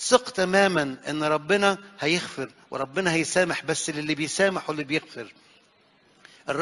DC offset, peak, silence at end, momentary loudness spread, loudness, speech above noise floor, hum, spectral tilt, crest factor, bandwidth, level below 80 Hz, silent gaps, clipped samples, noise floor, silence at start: under 0.1%; -2 dBFS; 0 s; 13 LU; -25 LUFS; 36 dB; none; -3.5 dB/octave; 24 dB; 11.5 kHz; -64 dBFS; none; under 0.1%; -61 dBFS; 0 s